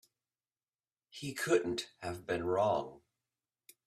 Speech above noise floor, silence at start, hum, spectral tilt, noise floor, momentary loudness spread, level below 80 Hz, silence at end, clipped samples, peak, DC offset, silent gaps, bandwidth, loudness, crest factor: over 56 dB; 1.15 s; none; -4.5 dB/octave; under -90 dBFS; 13 LU; -70 dBFS; 0.9 s; under 0.1%; -16 dBFS; under 0.1%; none; 15 kHz; -35 LUFS; 22 dB